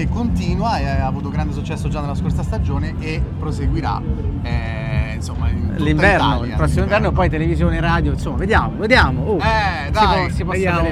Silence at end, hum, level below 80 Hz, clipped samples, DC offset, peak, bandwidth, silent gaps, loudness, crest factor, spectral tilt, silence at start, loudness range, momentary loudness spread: 0 s; none; -24 dBFS; under 0.1%; under 0.1%; 0 dBFS; 12 kHz; none; -18 LUFS; 18 dB; -7 dB/octave; 0 s; 5 LU; 9 LU